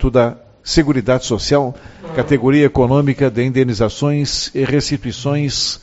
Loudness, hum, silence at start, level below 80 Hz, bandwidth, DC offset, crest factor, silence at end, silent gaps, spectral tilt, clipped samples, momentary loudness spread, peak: -16 LUFS; none; 0 s; -32 dBFS; 8.2 kHz; under 0.1%; 16 dB; 0.05 s; none; -5.5 dB/octave; under 0.1%; 8 LU; 0 dBFS